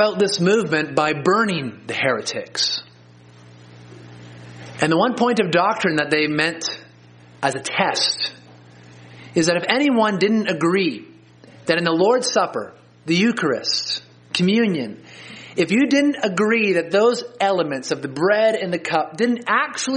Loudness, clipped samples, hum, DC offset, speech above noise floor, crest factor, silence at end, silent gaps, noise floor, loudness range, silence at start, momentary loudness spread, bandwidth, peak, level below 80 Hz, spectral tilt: -19 LUFS; under 0.1%; none; under 0.1%; 28 dB; 20 dB; 0 s; none; -47 dBFS; 4 LU; 0 s; 10 LU; 10 kHz; 0 dBFS; -64 dBFS; -4 dB/octave